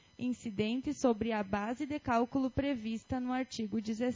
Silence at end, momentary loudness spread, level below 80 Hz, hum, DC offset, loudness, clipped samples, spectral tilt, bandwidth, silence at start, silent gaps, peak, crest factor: 0 s; 6 LU; -56 dBFS; none; under 0.1%; -35 LUFS; under 0.1%; -5.5 dB/octave; 7.6 kHz; 0.2 s; none; -16 dBFS; 18 dB